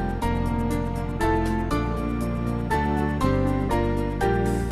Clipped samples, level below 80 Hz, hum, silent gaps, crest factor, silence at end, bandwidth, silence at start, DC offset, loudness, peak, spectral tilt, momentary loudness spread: under 0.1%; -30 dBFS; none; none; 16 dB; 0 s; 14 kHz; 0 s; 0.2%; -25 LUFS; -8 dBFS; -7.5 dB/octave; 4 LU